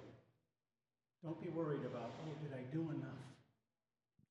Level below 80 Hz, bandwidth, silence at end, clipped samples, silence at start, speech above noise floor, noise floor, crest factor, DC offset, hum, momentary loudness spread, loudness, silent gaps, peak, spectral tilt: -86 dBFS; 10 kHz; 0.9 s; under 0.1%; 0 s; over 45 dB; under -90 dBFS; 18 dB; under 0.1%; none; 13 LU; -47 LUFS; none; -30 dBFS; -8.5 dB/octave